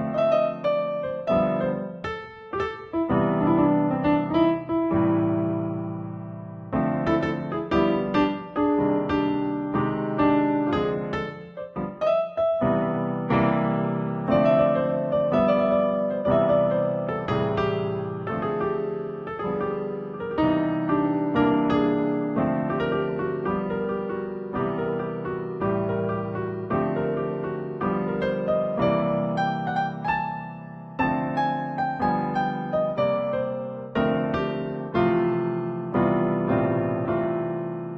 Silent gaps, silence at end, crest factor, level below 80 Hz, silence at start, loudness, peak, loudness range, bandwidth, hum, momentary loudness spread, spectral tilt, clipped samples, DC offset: none; 0 s; 16 dB; -50 dBFS; 0 s; -25 LUFS; -8 dBFS; 5 LU; 6.6 kHz; none; 9 LU; -9 dB/octave; under 0.1%; under 0.1%